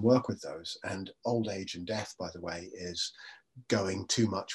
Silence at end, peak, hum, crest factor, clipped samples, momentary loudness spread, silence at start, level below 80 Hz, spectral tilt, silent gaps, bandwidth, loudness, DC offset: 0 s; -12 dBFS; none; 22 dB; under 0.1%; 11 LU; 0 s; -72 dBFS; -4.5 dB/octave; none; 12 kHz; -34 LUFS; under 0.1%